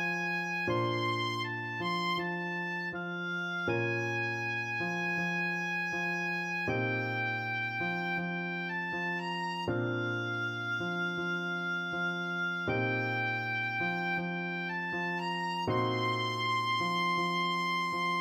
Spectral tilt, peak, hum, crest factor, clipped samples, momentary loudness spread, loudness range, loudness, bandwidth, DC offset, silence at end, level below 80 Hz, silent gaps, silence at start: -5.5 dB/octave; -20 dBFS; none; 14 dB; under 0.1%; 4 LU; 2 LU; -32 LUFS; 15.5 kHz; under 0.1%; 0 s; -70 dBFS; none; 0 s